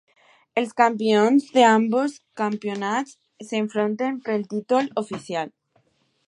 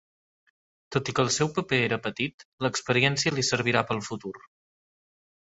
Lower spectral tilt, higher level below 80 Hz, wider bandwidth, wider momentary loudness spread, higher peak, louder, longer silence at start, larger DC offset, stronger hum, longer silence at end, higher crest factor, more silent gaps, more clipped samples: about the same, -5 dB/octave vs -4 dB/octave; second, -76 dBFS vs -60 dBFS; first, 11 kHz vs 8.2 kHz; first, 13 LU vs 9 LU; first, -2 dBFS vs -6 dBFS; first, -22 LUFS vs -26 LUFS; second, 0.55 s vs 0.9 s; neither; neither; second, 0.8 s vs 1.1 s; about the same, 20 dB vs 24 dB; second, none vs 2.34-2.38 s, 2.45-2.58 s; neither